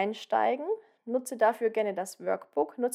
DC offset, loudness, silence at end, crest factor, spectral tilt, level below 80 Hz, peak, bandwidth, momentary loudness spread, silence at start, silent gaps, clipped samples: under 0.1%; -30 LUFS; 0 s; 16 dB; -4 dB/octave; under -90 dBFS; -12 dBFS; 15.5 kHz; 8 LU; 0 s; none; under 0.1%